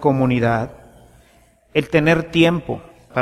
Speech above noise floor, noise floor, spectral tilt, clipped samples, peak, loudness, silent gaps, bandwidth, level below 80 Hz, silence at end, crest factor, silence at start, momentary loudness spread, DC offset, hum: 37 dB; -54 dBFS; -7 dB/octave; under 0.1%; -2 dBFS; -18 LUFS; none; 14 kHz; -46 dBFS; 0 s; 18 dB; 0 s; 14 LU; under 0.1%; none